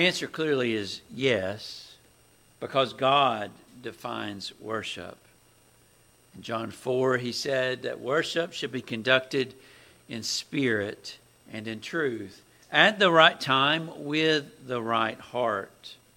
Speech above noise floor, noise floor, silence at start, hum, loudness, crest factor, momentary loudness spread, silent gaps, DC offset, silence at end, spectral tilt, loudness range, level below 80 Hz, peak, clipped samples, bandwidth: 33 dB; -60 dBFS; 0 s; none; -26 LUFS; 26 dB; 19 LU; none; under 0.1%; 0.25 s; -4 dB/octave; 9 LU; -70 dBFS; -2 dBFS; under 0.1%; 16.5 kHz